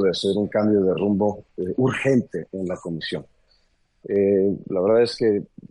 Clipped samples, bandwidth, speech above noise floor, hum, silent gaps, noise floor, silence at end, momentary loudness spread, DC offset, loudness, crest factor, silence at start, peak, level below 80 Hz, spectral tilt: under 0.1%; 11 kHz; 42 dB; none; none; -63 dBFS; 0.25 s; 11 LU; under 0.1%; -22 LUFS; 14 dB; 0 s; -8 dBFS; -58 dBFS; -7 dB/octave